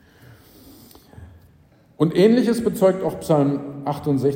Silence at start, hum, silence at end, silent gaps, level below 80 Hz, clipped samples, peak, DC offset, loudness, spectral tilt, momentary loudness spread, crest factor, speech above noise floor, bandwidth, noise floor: 1.15 s; none; 0 s; none; -54 dBFS; under 0.1%; -4 dBFS; under 0.1%; -20 LUFS; -7.5 dB/octave; 10 LU; 18 dB; 35 dB; 16.5 kHz; -54 dBFS